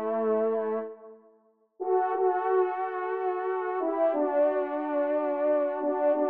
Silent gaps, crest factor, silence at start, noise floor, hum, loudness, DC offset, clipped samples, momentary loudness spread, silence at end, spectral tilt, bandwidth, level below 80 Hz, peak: none; 14 dB; 0 s; -64 dBFS; none; -28 LUFS; under 0.1%; under 0.1%; 6 LU; 0 s; -5 dB/octave; 3.9 kHz; -86 dBFS; -14 dBFS